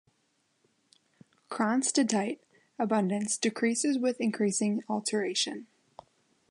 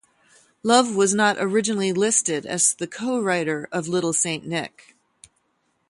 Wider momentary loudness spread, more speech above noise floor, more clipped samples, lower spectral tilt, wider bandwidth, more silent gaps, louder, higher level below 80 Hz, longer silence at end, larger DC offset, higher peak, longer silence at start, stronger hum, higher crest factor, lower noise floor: about the same, 8 LU vs 9 LU; about the same, 45 dB vs 48 dB; neither; about the same, -3.5 dB/octave vs -3 dB/octave; about the same, 11.5 kHz vs 11.5 kHz; neither; second, -29 LUFS vs -21 LUFS; second, -82 dBFS vs -68 dBFS; second, 0.85 s vs 1.2 s; neither; second, -14 dBFS vs -2 dBFS; first, 1.5 s vs 0.65 s; neither; about the same, 18 dB vs 20 dB; first, -74 dBFS vs -70 dBFS